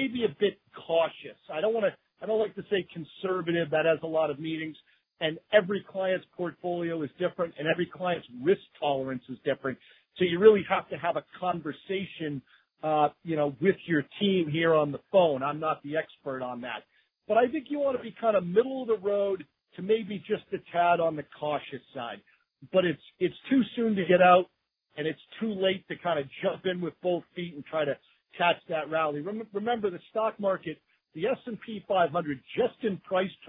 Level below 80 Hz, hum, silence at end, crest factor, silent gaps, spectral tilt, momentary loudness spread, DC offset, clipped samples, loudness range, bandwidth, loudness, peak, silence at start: -72 dBFS; none; 0 s; 22 dB; none; -9.5 dB/octave; 11 LU; under 0.1%; under 0.1%; 4 LU; 4 kHz; -29 LUFS; -8 dBFS; 0 s